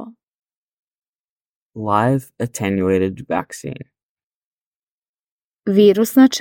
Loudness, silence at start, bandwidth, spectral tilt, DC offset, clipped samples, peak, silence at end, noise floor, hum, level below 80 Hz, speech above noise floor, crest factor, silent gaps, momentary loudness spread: -17 LUFS; 0 s; 17 kHz; -6 dB/octave; under 0.1%; under 0.1%; -2 dBFS; 0 s; under -90 dBFS; none; -58 dBFS; over 74 dB; 18 dB; 0.23-0.43 s, 0.55-1.03 s, 1.09-1.13 s, 1.19-1.70 s, 4.03-4.17 s, 4.23-5.02 s, 5.08-5.57 s; 18 LU